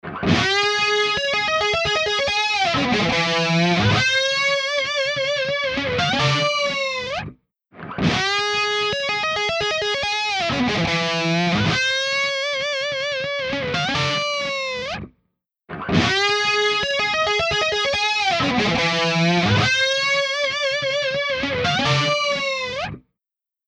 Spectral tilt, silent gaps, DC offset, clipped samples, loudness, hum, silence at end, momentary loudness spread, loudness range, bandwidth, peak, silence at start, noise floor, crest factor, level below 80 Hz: -4 dB/octave; none; under 0.1%; under 0.1%; -19 LUFS; none; 0.7 s; 6 LU; 3 LU; 10.5 kHz; -4 dBFS; 0.05 s; -89 dBFS; 16 dB; -48 dBFS